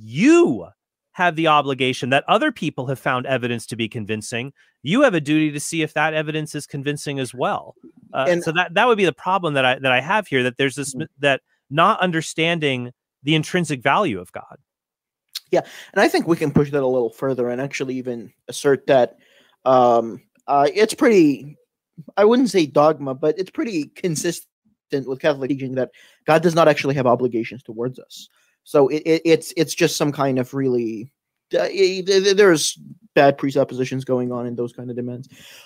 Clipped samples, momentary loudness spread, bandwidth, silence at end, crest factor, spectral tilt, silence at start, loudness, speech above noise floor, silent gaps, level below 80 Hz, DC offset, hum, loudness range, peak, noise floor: under 0.1%; 13 LU; 16 kHz; 0.45 s; 18 dB; -5 dB/octave; 0 s; -19 LUFS; 68 dB; 24.52-24.62 s; -64 dBFS; under 0.1%; none; 4 LU; -2 dBFS; -87 dBFS